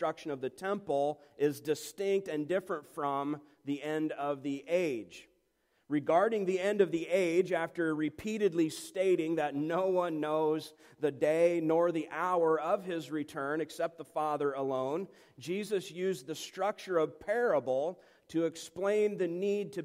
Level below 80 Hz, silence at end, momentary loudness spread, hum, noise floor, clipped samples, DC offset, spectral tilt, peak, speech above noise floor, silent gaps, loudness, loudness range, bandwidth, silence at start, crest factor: -76 dBFS; 0 s; 9 LU; none; -75 dBFS; under 0.1%; under 0.1%; -5.5 dB/octave; -14 dBFS; 43 dB; none; -33 LUFS; 5 LU; 16 kHz; 0 s; 18 dB